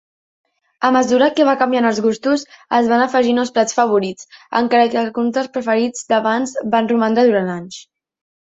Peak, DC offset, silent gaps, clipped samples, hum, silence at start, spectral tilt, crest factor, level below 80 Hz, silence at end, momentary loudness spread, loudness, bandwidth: -2 dBFS; under 0.1%; none; under 0.1%; none; 0.8 s; -4.5 dB/octave; 16 dB; -62 dBFS; 0.75 s; 7 LU; -16 LUFS; 8 kHz